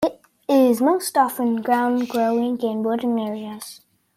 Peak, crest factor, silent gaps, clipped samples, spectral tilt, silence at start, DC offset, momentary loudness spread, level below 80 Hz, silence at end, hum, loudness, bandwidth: -6 dBFS; 16 dB; none; under 0.1%; -4.5 dB/octave; 0 s; under 0.1%; 15 LU; -66 dBFS; 0.4 s; none; -21 LUFS; 16 kHz